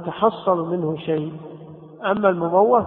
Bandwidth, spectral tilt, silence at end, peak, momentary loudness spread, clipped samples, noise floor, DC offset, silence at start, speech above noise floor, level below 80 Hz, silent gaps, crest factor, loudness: 4.2 kHz; -11.5 dB/octave; 0 s; -2 dBFS; 20 LU; under 0.1%; -40 dBFS; under 0.1%; 0 s; 20 dB; -62 dBFS; none; 18 dB; -21 LUFS